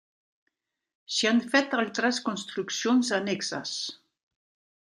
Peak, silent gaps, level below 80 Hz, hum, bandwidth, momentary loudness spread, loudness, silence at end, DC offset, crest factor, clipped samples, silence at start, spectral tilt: -8 dBFS; none; -80 dBFS; none; 11.5 kHz; 9 LU; -27 LUFS; 0.95 s; under 0.1%; 20 dB; under 0.1%; 1.1 s; -3 dB/octave